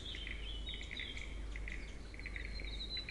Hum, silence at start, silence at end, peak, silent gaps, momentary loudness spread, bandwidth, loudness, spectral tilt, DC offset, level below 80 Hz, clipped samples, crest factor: none; 0 s; 0 s; -28 dBFS; none; 5 LU; 11.5 kHz; -45 LUFS; -3.5 dB/octave; under 0.1%; -46 dBFS; under 0.1%; 16 dB